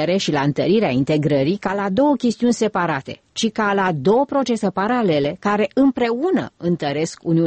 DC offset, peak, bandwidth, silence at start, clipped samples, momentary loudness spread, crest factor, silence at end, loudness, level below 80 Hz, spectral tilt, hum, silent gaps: under 0.1%; -6 dBFS; 8.8 kHz; 0 s; under 0.1%; 6 LU; 12 dB; 0 s; -19 LUFS; -54 dBFS; -6 dB/octave; none; none